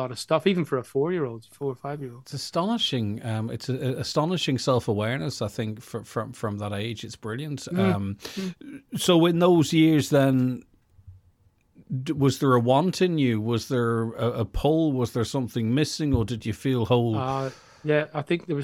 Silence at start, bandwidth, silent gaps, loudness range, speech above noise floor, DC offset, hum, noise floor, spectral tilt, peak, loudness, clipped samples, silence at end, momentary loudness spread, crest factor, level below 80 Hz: 0 s; 16.5 kHz; none; 6 LU; 37 dB; under 0.1%; none; -62 dBFS; -6 dB/octave; -8 dBFS; -25 LUFS; under 0.1%; 0 s; 13 LU; 18 dB; -48 dBFS